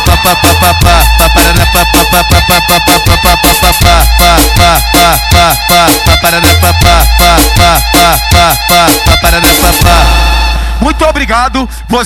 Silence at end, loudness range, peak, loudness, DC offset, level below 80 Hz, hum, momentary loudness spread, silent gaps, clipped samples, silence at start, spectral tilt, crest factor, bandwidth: 0 s; 1 LU; 0 dBFS; -5 LUFS; under 0.1%; -12 dBFS; none; 4 LU; none; 10%; 0 s; -3.5 dB/octave; 6 dB; over 20 kHz